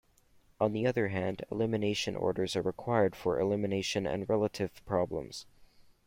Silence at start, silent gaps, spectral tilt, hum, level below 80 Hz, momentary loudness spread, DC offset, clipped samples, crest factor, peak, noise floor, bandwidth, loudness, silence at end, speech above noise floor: 0.6 s; none; -5.5 dB/octave; none; -60 dBFS; 6 LU; under 0.1%; under 0.1%; 18 dB; -14 dBFS; -65 dBFS; 16.5 kHz; -32 LUFS; 0.25 s; 33 dB